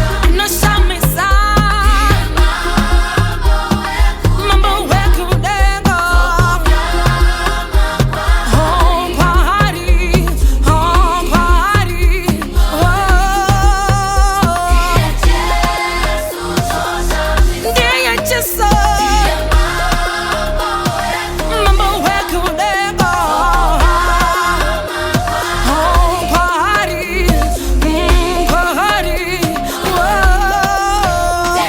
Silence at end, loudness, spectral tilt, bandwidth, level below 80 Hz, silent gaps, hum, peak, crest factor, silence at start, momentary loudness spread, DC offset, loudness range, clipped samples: 0 s; -13 LUFS; -4.5 dB/octave; 20 kHz; -16 dBFS; none; none; 0 dBFS; 12 dB; 0 s; 4 LU; under 0.1%; 2 LU; under 0.1%